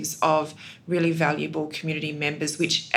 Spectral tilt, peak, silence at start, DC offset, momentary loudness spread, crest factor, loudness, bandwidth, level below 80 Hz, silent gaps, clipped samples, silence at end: -4 dB/octave; -2 dBFS; 0 s; under 0.1%; 7 LU; 24 dB; -25 LUFS; 16.5 kHz; -76 dBFS; none; under 0.1%; 0 s